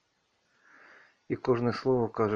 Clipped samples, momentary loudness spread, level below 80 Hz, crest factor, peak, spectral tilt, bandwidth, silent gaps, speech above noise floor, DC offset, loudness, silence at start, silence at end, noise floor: under 0.1%; 7 LU; -60 dBFS; 18 dB; -12 dBFS; -8 dB/octave; 7 kHz; none; 46 dB; under 0.1%; -29 LUFS; 1.3 s; 0 s; -74 dBFS